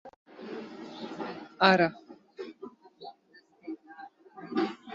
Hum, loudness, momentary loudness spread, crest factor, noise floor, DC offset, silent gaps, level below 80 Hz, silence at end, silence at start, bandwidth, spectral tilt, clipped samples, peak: none; -29 LUFS; 26 LU; 26 dB; -62 dBFS; under 0.1%; 0.16-0.26 s; -74 dBFS; 0 s; 0.05 s; 7.6 kHz; -6 dB/octave; under 0.1%; -8 dBFS